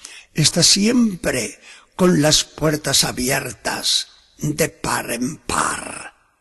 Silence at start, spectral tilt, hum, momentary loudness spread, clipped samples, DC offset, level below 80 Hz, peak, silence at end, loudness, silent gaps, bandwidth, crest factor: 0.05 s; -3 dB/octave; none; 15 LU; under 0.1%; under 0.1%; -44 dBFS; -2 dBFS; 0.3 s; -18 LUFS; none; 13 kHz; 18 dB